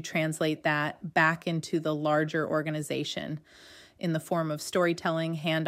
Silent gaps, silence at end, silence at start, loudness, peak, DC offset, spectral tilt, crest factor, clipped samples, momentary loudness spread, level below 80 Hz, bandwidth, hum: none; 0 s; 0 s; -29 LUFS; -12 dBFS; under 0.1%; -5 dB/octave; 18 dB; under 0.1%; 7 LU; -72 dBFS; 16 kHz; none